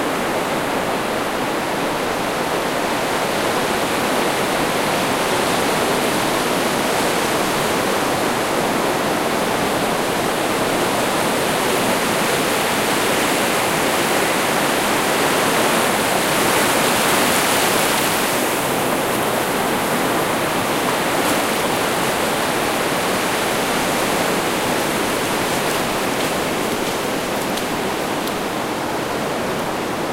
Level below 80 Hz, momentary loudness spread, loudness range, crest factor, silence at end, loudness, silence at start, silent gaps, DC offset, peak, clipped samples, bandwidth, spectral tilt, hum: -46 dBFS; 5 LU; 4 LU; 16 dB; 0 s; -18 LUFS; 0 s; none; under 0.1%; -2 dBFS; under 0.1%; 16 kHz; -3 dB/octave; none